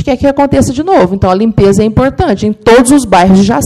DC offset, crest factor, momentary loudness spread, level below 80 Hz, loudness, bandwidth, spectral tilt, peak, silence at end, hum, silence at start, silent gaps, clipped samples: under 0.1%; 8 dB; 5 LU; -28 dBFS; -8 LUFS; 13.5 kHz; -6 dB/octave; 0 dBFS; 0 s; none; 0 s; none; 2%